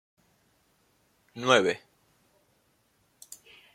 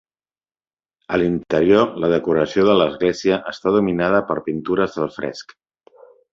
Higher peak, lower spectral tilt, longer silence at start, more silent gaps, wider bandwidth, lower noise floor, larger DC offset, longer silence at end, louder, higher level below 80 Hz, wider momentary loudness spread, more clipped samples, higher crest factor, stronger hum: about the same, -4 dBFS vs -2 dBFS; second, -3.5 dB/octave vs -6.5 dB/octave; first, 1.35 s vs 1.1 s; neither; first, 16.5 kHz vs 7.6 kHz; second, -69 dBFS vs under -90 dBFS; neither; first, 1.95 s vs 0.9 s; second, -25 LUFS vs -19 LUFS; second, -78 dBFS vs -50 dBFS; first, 25 LU vs 9 LU; neither; first, 28 dB vs 18 dB; neither